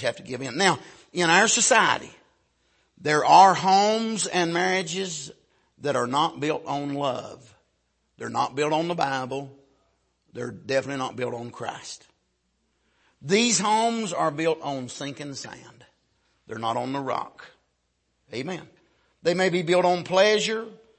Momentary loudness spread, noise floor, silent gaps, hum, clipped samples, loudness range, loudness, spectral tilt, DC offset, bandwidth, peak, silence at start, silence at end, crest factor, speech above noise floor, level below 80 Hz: 19 LU; -73 dBFS; none; none; under 0.1%; 13 LU; -23 LUFS; -3 dB/octave; under 0.1%; 8.8 kHz; -4 dBFS; 0 s; 0.25 s; 22 dB; 49 dB; -70 dBFS